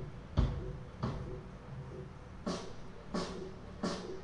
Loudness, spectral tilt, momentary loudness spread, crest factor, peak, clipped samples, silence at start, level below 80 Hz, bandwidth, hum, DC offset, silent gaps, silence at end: -41 LUFS; -6.5 dB/octave; 13 LU; 24 dB; -16 dBFS; under 0.1%; 0 s; -46 dBFS; 11 kHz; none; under 0.1%; none; 0 s